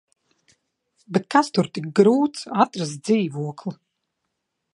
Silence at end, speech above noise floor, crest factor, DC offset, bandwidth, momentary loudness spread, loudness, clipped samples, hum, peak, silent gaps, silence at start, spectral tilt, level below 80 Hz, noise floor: 1 s; 57 dB; 22 dB; under 0.1%; 11.5 kHz; 12 LU; -21 LUFS; under 0.1%; none; -2 dBFS; none; 1.1 s; -6 dB/octave; -72 dBFS; -78 dBFS